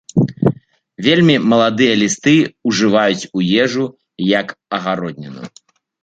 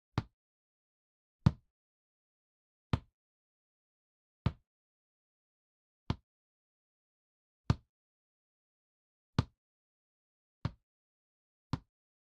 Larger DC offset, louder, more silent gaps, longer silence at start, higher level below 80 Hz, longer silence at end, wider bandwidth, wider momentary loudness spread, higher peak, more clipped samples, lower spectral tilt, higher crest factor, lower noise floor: neither; first, -15 LUFS vs -39 LUFS; second, none vs 0.33-1.39 s, 1.70-2.90 s, 3.14-4.45 s, 4.67-6.06 s, 6.23-7.64 s, 7.89-9.33 s, 9.57-10.61 s, 10.83-11.70 s; about the same, 0.15 s vs 0.15 s; about the same, -54 dBFS vs -56 dBFS; about the same, 0.55 s vs 0.5 s; first, 9.2 kHz vs 7.4 kHz; first, 14 LU vs 11 LU; first, -2 dBFS vs -12 dBFS; neither; second, -5 dB/octave vs -7 dB/octave; second, 14 dB vs 32 dB; second, -37 dBFS vs under -90 dBFS